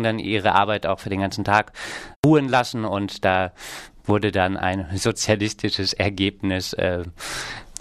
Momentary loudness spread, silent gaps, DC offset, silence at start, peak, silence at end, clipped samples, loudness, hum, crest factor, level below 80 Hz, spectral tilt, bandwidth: 12 LU; 2.16-2.23 s; under 0.1%; 0 s; -2 dBFS; 0.1 s; under 0.1%; -22 LUFS; none; 20 dB; -48 dBFS; -5 dB/octave; 14 kHz